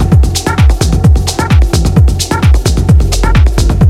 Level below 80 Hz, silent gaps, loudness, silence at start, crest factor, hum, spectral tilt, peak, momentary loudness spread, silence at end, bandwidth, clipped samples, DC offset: -10 dBFS; none; -10 LUFS; 0 s; 8 dB; none; -5.5 dB/octave; 0 dBFS; 2 LU; 0 s; 15 kHz; under 0.1%; under 0.1%